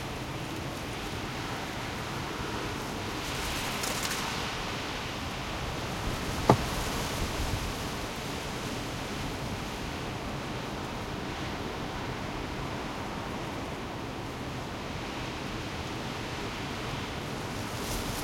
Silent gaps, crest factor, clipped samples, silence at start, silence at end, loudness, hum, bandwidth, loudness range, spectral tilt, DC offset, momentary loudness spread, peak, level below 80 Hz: none; 30 dB; under 0.1%; 0 s; 0 s; -34 LUFS; none; 16.5 kHz; 5 LU; -4 dB/octave; under 0.1%; 5 LU; -4 dBFS; -44 dBFS